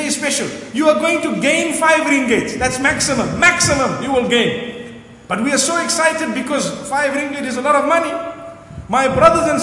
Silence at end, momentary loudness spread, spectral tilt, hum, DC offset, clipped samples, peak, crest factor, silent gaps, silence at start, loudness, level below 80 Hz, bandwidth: 0 s; 12 LU; -3 dB/octave; none; under 0.1%; under 0.1%; 0 dBFS; 16 dB; none; 0 s; -15 LUFS; -44 dBFS; 11.5 kHz